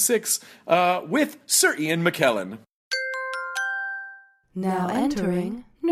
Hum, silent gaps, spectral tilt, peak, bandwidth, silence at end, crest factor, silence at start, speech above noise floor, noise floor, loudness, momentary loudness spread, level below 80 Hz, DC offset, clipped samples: none; 2.71-2.91 s; -3 dB/octave; -4 dBFS; 16 kHz; 0 s; 20 dB; 0 s; 23 dB; -46 dBFS; -24 LUFS; 12 LU; -60 dBFS; under 0.1%; under 0.1%